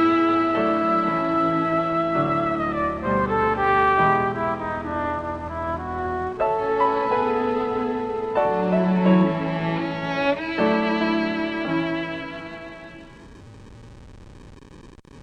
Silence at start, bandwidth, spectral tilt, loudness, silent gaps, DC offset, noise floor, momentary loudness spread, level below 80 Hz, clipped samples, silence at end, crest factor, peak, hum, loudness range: 0 s; 8.6 kHz; -8 dB/octave; -22 LUFS; none; under 0.1%; -45 dBFS; 10 LU; -46 dBFS; under 0.1%; 0 s; 18 dB; -6 dBFS; none; 7 LU